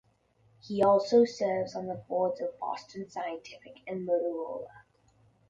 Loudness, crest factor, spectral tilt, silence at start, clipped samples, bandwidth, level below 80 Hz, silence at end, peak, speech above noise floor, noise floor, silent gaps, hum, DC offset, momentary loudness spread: -30 LUFS; 20 dB; -6 dB/octave; 0.65 s; under 0.1%; 7.8 kHz; -72 dBFS; 0.7 s; -12 dBFS; 37 dB; -67 dBFS; none; none; under 0.1%; 17 LU